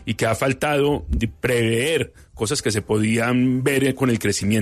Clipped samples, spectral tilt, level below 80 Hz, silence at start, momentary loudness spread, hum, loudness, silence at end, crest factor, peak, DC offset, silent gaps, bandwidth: under 0.1%; -5 dB/octave; -38 dBFS; 0 s; 5 LU; none; -21 LUFS; 0 s; 14 dB; -6 dBFS; under 0.1%; none; 13.5 kHz